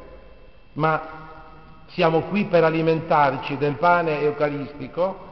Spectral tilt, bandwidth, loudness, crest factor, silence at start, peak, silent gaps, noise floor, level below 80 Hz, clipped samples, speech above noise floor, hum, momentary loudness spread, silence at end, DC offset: -5 dB/octave; 6 kHz; -21 LUFS; 18 dB; 0 s; -6 dBFS; none; -48 dBFS; -52 dBFS; under 0.1%; 27 dB; none; 16 LU; 0 s; 0.4%